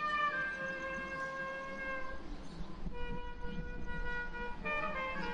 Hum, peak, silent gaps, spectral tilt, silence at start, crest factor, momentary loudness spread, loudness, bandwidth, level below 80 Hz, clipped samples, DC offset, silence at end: none; -24 dBFS; none; -5 dB/octave; 0 s; 14 dB; 11 LU; -40 LUFS; 8.8 kHz; -48 dBFS; under 0.1%; under 0.1%; 0 s